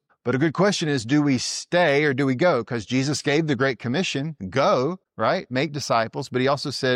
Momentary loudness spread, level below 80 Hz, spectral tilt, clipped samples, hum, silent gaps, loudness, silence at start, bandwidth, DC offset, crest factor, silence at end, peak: 6 LU; -62 dBFS; -5 dB/octave; under 0.1%; none; none; -22 LUFS; 0.25 s; 13 kHz; under 0.1%; 14 dB; 0 s; -8 dBFS